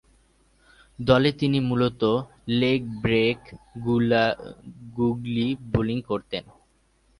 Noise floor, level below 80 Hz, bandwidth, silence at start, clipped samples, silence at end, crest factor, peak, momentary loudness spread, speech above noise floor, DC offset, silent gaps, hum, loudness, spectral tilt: -63 dBFS; -50 dBFS; 11 kHz; 1 s; under 0.1%; 0.75 s; 22 dB; -4 dBFS; 14 LU; 40 dB; under 0.1%; none; none; -24 LUFS; -7.5 dB/octave